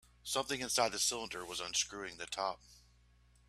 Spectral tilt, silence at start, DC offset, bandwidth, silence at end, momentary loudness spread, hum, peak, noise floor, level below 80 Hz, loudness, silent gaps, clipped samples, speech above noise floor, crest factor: -1 dB/octave; 0.25 s; under 0.1%; 15.5 kHz; 0.7 s; 9 LU; 60 Hz at -65 dBFS; -16 dBFS; -67 dBFS; -66 dBFS; -36 LUFS; none; under 0.1%; 29 dB; 22 dB